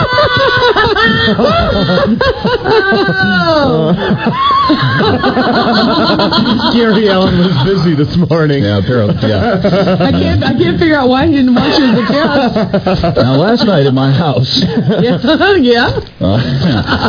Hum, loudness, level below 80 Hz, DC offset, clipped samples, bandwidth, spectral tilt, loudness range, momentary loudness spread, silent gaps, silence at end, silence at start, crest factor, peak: none; -10 LUFS; -32 dBFS; under 0.1%; under 0.1%; 5.2 kHz; -7 dB/octave; 1 LU; 3 LU; none; 0 s; 0 s; 10 dB; 0 dBFS